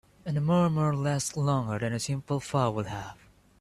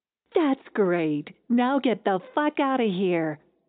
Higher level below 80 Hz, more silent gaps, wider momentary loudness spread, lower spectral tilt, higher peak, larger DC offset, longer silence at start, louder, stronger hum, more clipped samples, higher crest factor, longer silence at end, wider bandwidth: first, -58 dBFS vs -80 dBFS; neither; first, 10 LU vs 5 LU; about the same, -6 dB/octave vs -5 dB/octave; second, -12 dBFS vs -8 dBFS; neither; about the same, 0.25 s vs 0.35 s; second, -28 LUFS vs -25 LUFS; neither; neither; about the same, 16 dB vs 16 dB; first, 0.45 s vs 0.3 s; first, 13 kHz vs 4.5 kHz